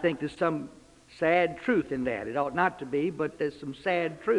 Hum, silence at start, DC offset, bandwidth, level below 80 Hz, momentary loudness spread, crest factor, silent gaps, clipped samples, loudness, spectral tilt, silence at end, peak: none; 0 s; under 0.1%; 11 kHz; -62 dBFS; 8 LU; 18 dB; none; under 0.1%; -29 LUFS; -6.5 dB/octave; 0 s; -10 dBFS